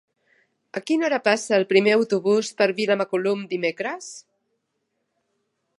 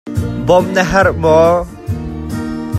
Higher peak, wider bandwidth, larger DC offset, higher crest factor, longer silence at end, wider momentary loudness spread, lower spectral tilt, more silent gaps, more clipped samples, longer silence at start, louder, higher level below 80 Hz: second, -4 dBFS vs 0 dBFS; second, 11.5 kHz vs 15 kHz; neither; first, 20 dB vs 14 dB; first, 1.6 s vs 0 s; first, 16 LU vs 12 LU; second, -4.5 dB/octave vs -6.5 dB/octave; neither; neither; first, 0.75 s vs 0.05 s; second, -22 LUFS vs -14 LUFS; second, -78 dBFS vs -32 dBFS